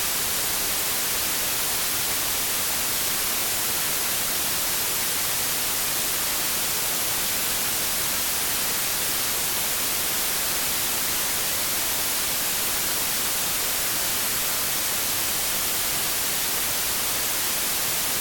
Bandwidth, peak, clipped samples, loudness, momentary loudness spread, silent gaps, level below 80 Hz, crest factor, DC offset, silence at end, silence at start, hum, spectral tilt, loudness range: 17.5 kHz; -10 dBFS; under 0.1%; -22 LUFS; 0 LU; none; -48 dBFS; 14 dB; under 0.1%; 0 s; 0 s; none; 0 dB/octave; 0 LU